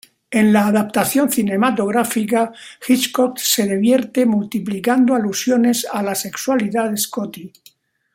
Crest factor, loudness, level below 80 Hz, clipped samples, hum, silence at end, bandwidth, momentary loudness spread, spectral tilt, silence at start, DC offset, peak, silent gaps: 16 dB; -17 LUFS; -62 dBFS; under 0.1%; none; 0.65 s; 16.5 kHz; 7 LU; -4 dB/octave; 0.3 s; under 0.1%; -2 dBFS; none